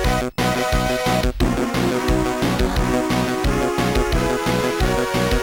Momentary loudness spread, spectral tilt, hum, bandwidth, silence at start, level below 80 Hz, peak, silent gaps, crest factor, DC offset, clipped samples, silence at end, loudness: 1 LU; -5 dB/octave; none; 19 kHz; 0 s; -26 dBFS; -6 dBFS; none; 12 dB; under 0.1%; under 0.1%; 0 s; -20 LUFS